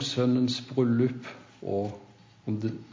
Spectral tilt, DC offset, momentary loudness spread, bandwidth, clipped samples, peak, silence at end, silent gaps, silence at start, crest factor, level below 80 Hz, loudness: -6.5 dB/octave; under 0.1%; 16 LU; 7.6 kHz; under 0.1%; -12 dBFS; 0 s; none; 0 s; 16 dB; -64 dBFS; -28 LUFS